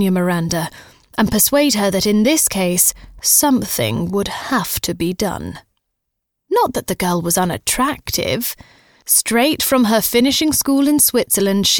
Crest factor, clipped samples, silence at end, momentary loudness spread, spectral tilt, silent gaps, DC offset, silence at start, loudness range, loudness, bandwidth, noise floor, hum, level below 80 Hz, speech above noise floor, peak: 16 dB; under 0.1%; 0 s; 9 LU; -3.5 dB/octave; none; 0.1%; 0 s; 6 LU; -16 LUFS; over 20 kHz; -76 dBFS; none; -44 dBFS; 60 dB; 0 dBFS